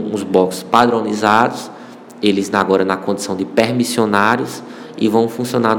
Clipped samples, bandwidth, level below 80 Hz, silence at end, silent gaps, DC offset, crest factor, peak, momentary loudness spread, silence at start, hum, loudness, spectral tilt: 0.4%; 18.5 kHz; -60 dBFS; 0 s; none; under 0.1%; 16 dB; 0 dBFS; 12 LU; 0 s; none; -16 LUFS; -5 dB/octave